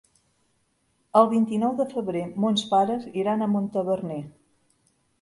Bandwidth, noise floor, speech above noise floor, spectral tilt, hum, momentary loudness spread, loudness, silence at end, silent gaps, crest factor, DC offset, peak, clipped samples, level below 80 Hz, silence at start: 11.5 kHz; -70 dBFS; 46 dB; -6.5 dB/octave; none; 9 LU; -24 LUFS; 0.9 s; none; 22 dB; under 0.1%; -4 dBFS; under 0.1%; -68 dBFS; 1.15 s